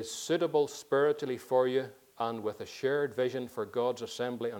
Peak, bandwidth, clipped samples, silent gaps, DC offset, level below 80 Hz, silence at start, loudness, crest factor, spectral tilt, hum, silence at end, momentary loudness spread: -16 dBFS; 18.5 kHz; under 0.1%; none; under 0.1%; -78 dBFS; 0 s; -32 LUFS; 16 dB; -4.5 dB/octave; none; 0 s; 9 LU